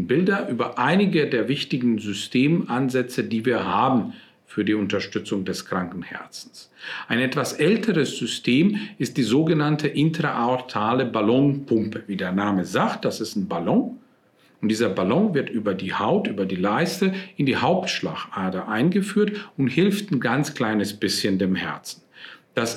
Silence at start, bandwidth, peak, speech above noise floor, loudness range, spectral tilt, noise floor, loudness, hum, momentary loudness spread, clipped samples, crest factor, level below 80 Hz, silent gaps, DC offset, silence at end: 0 s; 15.5 kHz; -6 dBFS; 36 dB; 3 LU; -5.5 dB/octave; -58 dBFS; -23 LUFS; none; 9 LU; under 0.1%; 16 dB; -66 dBFS; none; under 0.1%; 0 s